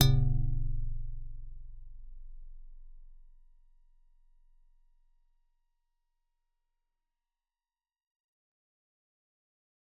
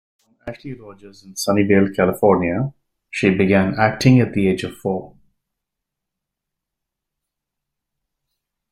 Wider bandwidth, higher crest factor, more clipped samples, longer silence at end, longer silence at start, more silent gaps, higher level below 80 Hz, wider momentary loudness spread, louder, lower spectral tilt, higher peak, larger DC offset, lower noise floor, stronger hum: second, 3.9 kHz vs 15 kHz; first, 30 dB vs 18 dB; neither; first, 6.75 s vs 3.65 s; second, 0 s vs 0.45 s; neither; first, -40 dBFS vs -52 dBFS; first, 26 LU vs 19 LU; second, -34 LUFS vs -18 LUFS; first, -9.5 dB/octave vs -6.5 dB/octave; second, -6 dBFS vs -2 dBFS; neither; first, under -90 dBFS vs -82 dBFS; neither